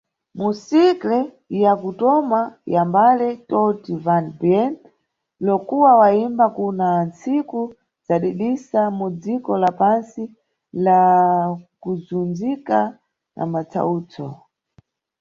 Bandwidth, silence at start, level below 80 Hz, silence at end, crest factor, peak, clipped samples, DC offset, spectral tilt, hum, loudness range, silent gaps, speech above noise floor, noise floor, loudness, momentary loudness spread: 7.4 kHz; 0.35 s; -64 dBFS; 0.85 s; 18 dB; -2 dBFS; under 0.1%; under 0.1%; -8 dB/octave; none; 4 LU; none; 51 dB; -70 dBFS; -19 LUFS; 13 LU